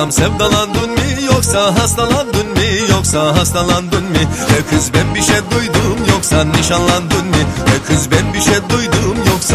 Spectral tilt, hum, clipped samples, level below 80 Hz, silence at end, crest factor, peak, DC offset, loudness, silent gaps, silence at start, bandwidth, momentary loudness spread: -4 dB/octave; none; under 0.1%; -24 dBFS; 0 s; 12 dB; 0 dBFS; under 0.1%; -13 LUFS; none; 0 s; 15.5 kHz; 3 LU